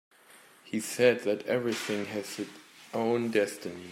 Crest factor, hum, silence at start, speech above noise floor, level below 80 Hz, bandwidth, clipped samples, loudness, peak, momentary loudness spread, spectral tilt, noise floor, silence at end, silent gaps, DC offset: 22 dB; none; 0.35 s; 27 dB; -80 dBFS; 16 kHz; under 0.1%; -30 LUFS; -10 dBFS; 14 LU; -4.5 dB/octave; -57 dBFS; 0 s; none; under 0.1%